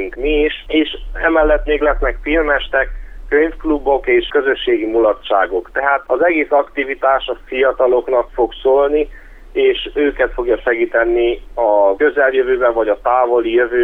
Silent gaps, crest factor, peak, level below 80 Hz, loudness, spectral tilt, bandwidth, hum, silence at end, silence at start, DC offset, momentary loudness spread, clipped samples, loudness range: none; 14 dB; 0 dBFS; -30 dBFS; -15 LUFS; -7 dB/octave; 4 kHz; none; 0 s; 0 s; under 0.1%; 5 LU; under 0.1%; 1 LU